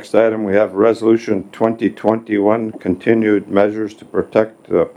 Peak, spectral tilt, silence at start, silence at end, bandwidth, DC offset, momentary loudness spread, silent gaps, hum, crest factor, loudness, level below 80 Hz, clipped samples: 0 dBFS; -7.5 dB/octave; 0 s; 0.05 s; 10.5 kHz; under 0.1%; 6 LU; none; none; 16 dB; -16 LUFS; -58 dBFS; under 0.1%